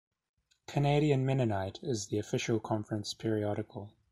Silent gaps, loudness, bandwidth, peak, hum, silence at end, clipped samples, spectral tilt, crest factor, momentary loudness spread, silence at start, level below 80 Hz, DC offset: none; -33 LUFS; 12 kHz; -14 dBFS; none; 0.25 s; under 0.1%; -6 dB/octave; 18 dB; 9 LU; 0.7 s; -62 dBFS; under 0.1%